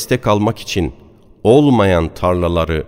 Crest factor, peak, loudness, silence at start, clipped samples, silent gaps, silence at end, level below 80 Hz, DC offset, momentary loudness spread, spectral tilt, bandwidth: 14 dB; 0 dBFS; -15 LUFS; 0 s; under 0.1%; none; 0 s; -32 dBFS; under 0.1%; 10 LU; -6.5 dB/octave; 16 kHz